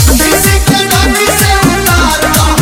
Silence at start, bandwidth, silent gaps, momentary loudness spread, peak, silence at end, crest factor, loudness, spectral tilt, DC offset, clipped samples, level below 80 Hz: 0 s; over 20 kHz; none; 1 LU; 0 dBFS; 0 s; 8 dB; -7 LUFS; -3.5 dB/octave; under 0.1%; 0.6%; -16 dBFS